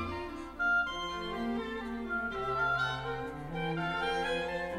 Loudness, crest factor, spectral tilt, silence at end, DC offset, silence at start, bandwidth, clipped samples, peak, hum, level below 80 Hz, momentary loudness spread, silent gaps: -34 LUFS; 12 dB; -5.5 dB/octave; 0 s; under 0.1%; 0 s; 15.5 kHz; under 0.1%; -22 dBFS; none; -52 dBFS; 8 LU; none